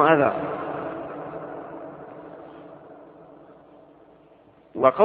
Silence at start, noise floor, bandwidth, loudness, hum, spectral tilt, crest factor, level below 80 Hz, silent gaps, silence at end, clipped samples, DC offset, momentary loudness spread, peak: 0 s; -54 dBFS; 4.4 kHz; -26 LUFS; none; -9.5 dB/octave; 24 dB; -66 dBFS; none; 0 s; under 0.1%; under 0.1%; 26 LU; -2 dBFS